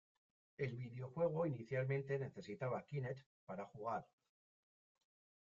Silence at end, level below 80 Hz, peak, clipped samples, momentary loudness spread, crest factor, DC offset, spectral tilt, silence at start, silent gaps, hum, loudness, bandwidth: 1.35 s; -80 dBFS; -28 dBFS; under 0.1%; 10 LU; 18 dB; under 0.1%; -7.5 dB/octave; 0.6 s; 3.26-3.47 s; none; -45 LUFS; 7.4 kHz